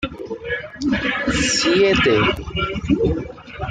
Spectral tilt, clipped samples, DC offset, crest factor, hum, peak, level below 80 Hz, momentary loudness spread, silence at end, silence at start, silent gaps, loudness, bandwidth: -4 dB/octave; under 0.1%; under 0.1%; 14 dB; none; -4 dBFS; -36 dBFS; 13 LU; 0 s; 0 s; none; -19 LUFS; 9.6 kHz